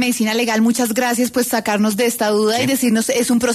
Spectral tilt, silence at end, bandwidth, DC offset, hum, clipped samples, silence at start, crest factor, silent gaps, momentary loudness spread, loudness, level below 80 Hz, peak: -3.5 dB/octave; 0 s; 14 kHz; under 0.1%; none; under 0.1%; 0 s; 10 dB; none; 2 LU; -16 LUFS; -56 dBFS; -6 dBFS